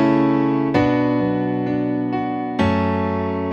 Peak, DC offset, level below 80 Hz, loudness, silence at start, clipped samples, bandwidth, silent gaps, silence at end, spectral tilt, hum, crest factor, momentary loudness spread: -4 dBFS; under 0.1%; -46 dBFS; -20 LUFS; 0 s; under 0.1%; 7 kHz; none; 0 s; -8.5 dB/octave; none; 14 dB; 5 LU